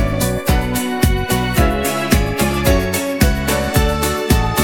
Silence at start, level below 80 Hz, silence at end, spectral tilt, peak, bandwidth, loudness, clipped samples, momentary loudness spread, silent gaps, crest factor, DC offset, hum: 0 s; -22 dBFS; 0 s; -5 dB/octave; 0 dBFS; 19 kHz; -16 LUFS; under 0.1%; 2 LU; none; 16 dB; 0.8%; none